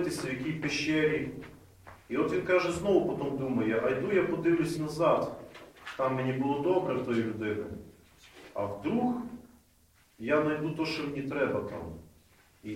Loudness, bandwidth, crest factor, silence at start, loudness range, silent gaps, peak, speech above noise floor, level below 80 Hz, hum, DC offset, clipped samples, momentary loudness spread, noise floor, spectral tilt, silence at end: -30 LUFS; 16 kHz; 18 dB; 0 s; 5 LU; none; -12 dBFS; 35 dB; -60 dBFS; none; under 0.1%; under 0.1%; 16 LU; -64 dBFS; -6 dB/octave; 0 s